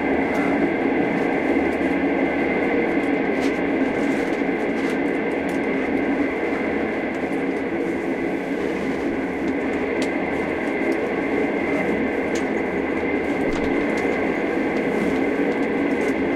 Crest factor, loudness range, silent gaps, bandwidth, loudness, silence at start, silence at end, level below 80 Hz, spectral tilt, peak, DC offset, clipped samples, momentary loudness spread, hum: 14 dB; 3 LU; none; 12 kHz; -22 LUFS; 0 s; 0 s; -46 dBFS; -6.5 dB/octave; -8 dBFS; under 0.1%; under 0.1%; 3 LU; none